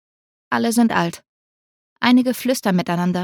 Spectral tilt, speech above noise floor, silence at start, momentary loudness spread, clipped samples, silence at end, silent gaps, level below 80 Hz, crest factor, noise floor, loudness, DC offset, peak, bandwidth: -5 dB/octave; over 72 dB; 0.5 s; 6 LU; under 0.1%; 0 s; 1.29-1.96 s; -64 dBFS; 18 dB; under -90 dBFS; -19 LUFS; under 0.1%; -2 dBFS; 18 kHz